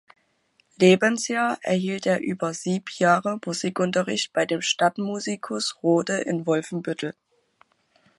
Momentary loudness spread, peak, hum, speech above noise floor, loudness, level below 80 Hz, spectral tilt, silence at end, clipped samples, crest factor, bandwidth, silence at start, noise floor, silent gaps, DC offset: 9 LU; -4 dBFS; none; 43 dB; -24 LUFS; -72 dBFS; -4.5 dB/octave; 1.05 s; under 0.1%; 20 dB; 11.5 kHz; 0.8 s; -66 dBFS; none; under 0.1%